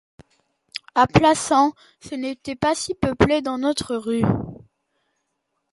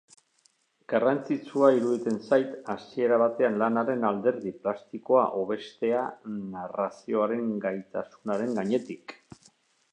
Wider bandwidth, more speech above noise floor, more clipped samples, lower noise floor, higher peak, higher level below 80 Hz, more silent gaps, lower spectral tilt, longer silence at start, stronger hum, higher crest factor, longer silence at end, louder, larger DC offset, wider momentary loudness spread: first, 11.5 kHz vs 9.6 kHz; first, 55 dB vs 41 dB; neither; first, -75 dBFS vs -68 dBFS; first, -2 dBFS vs -8 dBFS; first, -44 dBFS vs -76 dBFS; neither; second, -5 dB/octave vs -7 dB/octave; second, 0.75 s vs 0.9 s; neither; about the same, 20 dB vs 20 dB; first, 1.15 s vs 0.8 s; first, -21 LUFS vs -28 LUFS; neither; about the same, 13 LU vs 12 LU